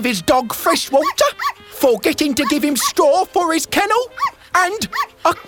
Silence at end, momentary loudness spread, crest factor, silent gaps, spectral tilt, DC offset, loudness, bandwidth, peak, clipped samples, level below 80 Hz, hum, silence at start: 0 s; 7 LU; 14 dB; none; -2.5 dB/octave; under 0.1%; -17 LUFS; 19 kHz; -2 dBFS; under 0.1%; -50 dBFS; none; 0 s